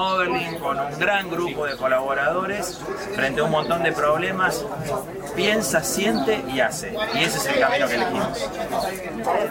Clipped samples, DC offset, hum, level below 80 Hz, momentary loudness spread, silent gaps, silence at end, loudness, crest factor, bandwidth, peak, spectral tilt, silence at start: under 0.1%; under 0.1%; none; -50 dBFS; 8 LU; none; 0 s; -22 LUFS; 18 dB; 17 kHz; -6 dBFS; -3.5 dB/octave; 0 s